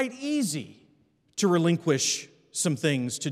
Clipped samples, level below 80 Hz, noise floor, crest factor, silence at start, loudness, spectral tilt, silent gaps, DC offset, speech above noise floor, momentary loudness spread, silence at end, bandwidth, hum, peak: under 0.1%; -78 dBFS; -65 dBFS; 18 dB; 0 s; -26 LUFS; -4 dB/octave; none; under 0.1%; 39 dB; 12 LU; 0 s; 15.5 kHz; none; -10 dBFS